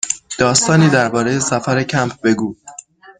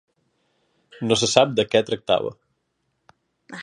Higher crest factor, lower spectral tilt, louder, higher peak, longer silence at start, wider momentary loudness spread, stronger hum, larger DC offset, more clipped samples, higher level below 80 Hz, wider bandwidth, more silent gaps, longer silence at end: second, 16 dB vs 24 dB; about the same, -4.5 dB/octave vs -3.5 dB/octave; first, -15 LUFS vs -21 LUFS; about the same, 0 dBFS vs 0 dBFS; second, 0.05 s vs 1 s; second, 11 LU vs 14 LU; neither; neither; neither; first, -50 dBFS vs -60 dBFS; second, 9.6 kHz vs 11 kHz; neither; about the same, 0.1 s vs 0 s